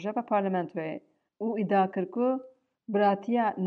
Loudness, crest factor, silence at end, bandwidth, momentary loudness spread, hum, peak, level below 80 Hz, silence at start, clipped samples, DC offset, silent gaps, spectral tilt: -29 LUFS; 16 dB; 0 s; 6.4 kHz; 10 LU; none; -12 dBFS; -86 dBFS; 0 s; under 0.1%; under 0.1%; none; -9 dB/octave